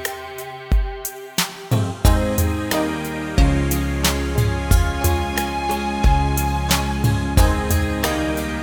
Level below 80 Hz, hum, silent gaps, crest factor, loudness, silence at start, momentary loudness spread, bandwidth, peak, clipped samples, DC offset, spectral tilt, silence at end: -22 dBFS; none; none; 18 dB; -20 LUFS; 0 s; 6 LU; over 20 kHz; -2 dBFS; under 0.1%; under 0.1%; -5 dB/octave; 0 s